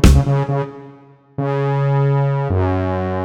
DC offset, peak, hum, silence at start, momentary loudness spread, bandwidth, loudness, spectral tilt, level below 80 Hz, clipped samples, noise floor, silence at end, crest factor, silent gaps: under 0.1%; 0 dBFS; none; 0 s; 11 LU; 13 kHz; -18 LUFS; -7.5 dB/octave; -22 dBFS; under 0.1%; -44 dBFS; 0 s; 16 dB; none